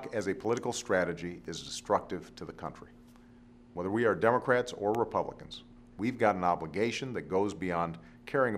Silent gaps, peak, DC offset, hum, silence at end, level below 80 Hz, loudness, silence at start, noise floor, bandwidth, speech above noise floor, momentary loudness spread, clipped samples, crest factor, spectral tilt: none; -10 dBFS; under 0.1%; none; 0 s; -62 dBFS; -32 LUFS; 0 s; -56 dBFS; 14.5 kHz; 24 dB; 17 LU; under 0.1%; 22 dB; -5 dB/octave